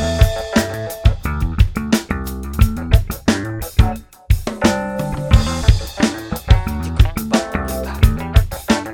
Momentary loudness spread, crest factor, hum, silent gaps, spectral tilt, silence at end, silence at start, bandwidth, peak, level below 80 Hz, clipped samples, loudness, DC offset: 7 LU; 16 dB; none; none; -6 dB/octave; 0 s; 0 s; 17.5 kHz; 0 dBFS; -20 dBFS; under 0.1%; -18 LUFS; under 0.1%